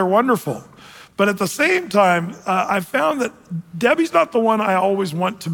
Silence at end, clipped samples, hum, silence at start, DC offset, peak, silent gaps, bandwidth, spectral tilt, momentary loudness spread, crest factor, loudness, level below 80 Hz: 0 s; under 0.1%; none; 0 s; under 0.1%; -4 dBFS; none; 17.5 kHz; -5 dB/octave; 10 LU; 16 dB; -18 LUFS; -64 dBFS